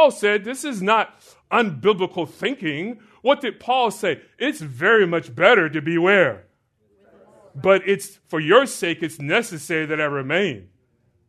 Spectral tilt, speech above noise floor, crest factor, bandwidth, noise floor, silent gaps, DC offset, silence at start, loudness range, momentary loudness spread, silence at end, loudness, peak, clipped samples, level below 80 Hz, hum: -4.5 dB/octave; 44 dB; 20 dB; 13.5 kHz; -64 dBFS; none; under 0.1%; 0 s; 4 LU; 10 LU; 0.7 s; -20 LUFS; 0 dBFS; under 0.1%; -68 dBFS; none